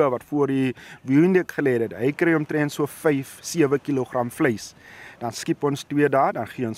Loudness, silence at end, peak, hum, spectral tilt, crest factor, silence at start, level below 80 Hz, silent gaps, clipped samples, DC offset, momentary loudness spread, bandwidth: -23 LUFS; 0 s; -6 dBFS; none; -6 dB/octave; 16 dB; 0 s; -64 dBFS; none; under 0.1%; under 0.1%; 12 LU; 16 kHz